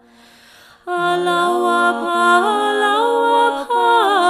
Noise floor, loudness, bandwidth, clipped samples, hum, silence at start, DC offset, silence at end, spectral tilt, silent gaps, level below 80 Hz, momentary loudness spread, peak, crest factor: -47 dBFS; -16 LUFS; 15.5 kHz; under 0.1%; none; 0.85 s; under 0.1%; 0 s; -3 dB/octave; none; -66 dBFS; 5 LU; -2 dBFS; 14 dB